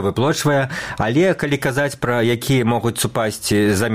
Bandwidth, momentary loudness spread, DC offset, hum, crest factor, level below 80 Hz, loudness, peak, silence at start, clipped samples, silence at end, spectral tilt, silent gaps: 16 kHz; 4 LU; 0.3%; none; 14 dB; -46 dBFS; -18 LUFS; -4 dBFS; 0 s; under 0.1%; 0 s; -5 dB/octave; none